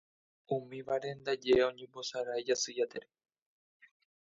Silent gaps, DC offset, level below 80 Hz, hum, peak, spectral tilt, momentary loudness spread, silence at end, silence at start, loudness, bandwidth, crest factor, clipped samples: none; under 0.1%; -70 dBFS; none; -16 dBFS; -3.5 dB/octave; 10 LU; 1.2 s; 0.5 s; -34 LUFS; 7.8 kHz; 20 dB; under 0.1%